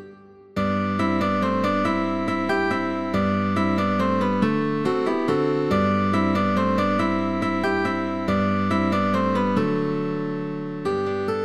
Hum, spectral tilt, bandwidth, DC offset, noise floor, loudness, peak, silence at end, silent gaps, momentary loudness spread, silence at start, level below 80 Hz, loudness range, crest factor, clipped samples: none; -7.5 dB/octave; 11.5 kHz; 0.7%; -46 dBFS; -23 LUFS; -8 dBFS; 0 s; none; 4 LU; 0 s; -54 dBFS; 2 LU; 14 dB; under 0.1%